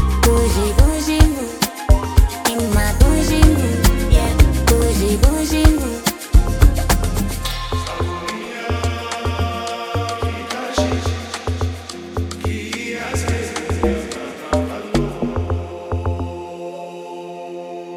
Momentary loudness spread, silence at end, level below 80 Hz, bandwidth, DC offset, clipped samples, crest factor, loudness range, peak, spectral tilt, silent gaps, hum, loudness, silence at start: 12 LU; 0 s; -20 dBFS; 18.5 kHz; under 0.1%; 0.1%; 16 dB; 7 LU; 0 dBFS; -5 dB/octave; none; none; -19 LUFS; 0 s